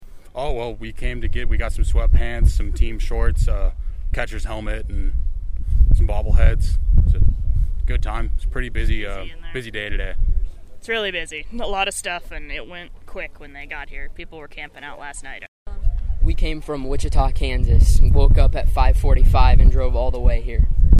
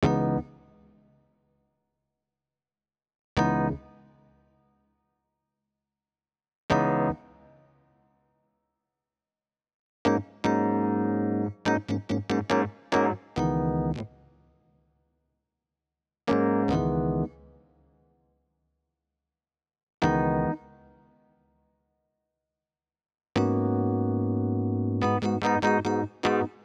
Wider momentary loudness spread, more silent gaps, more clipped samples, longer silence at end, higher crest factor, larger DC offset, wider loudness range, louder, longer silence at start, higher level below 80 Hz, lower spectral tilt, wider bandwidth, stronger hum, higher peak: first, 17 LU vs 7 LU; second, 15.48-15.65 s vs 3.19-3.36 s, 6.56-6.69 s, 9.74-10.05 s, 19.83-19.87 s, 19.94-19.98 s; neither; second, 0 s vs 0.15 s; second, 16 dB vs 22 dB; neither; first, 11 LU vs 8 LU; first, -22 LUFS vs -27 LUFS; about the same, 0 s vs 0 s; first, -18 dBFS vs -50 dBFS; second, -6 dB/octave vs -7.5 dB/octave; first, 11 kHz vs 9.4 kHz; neither; first, 0 dBFS vs -8 dBFS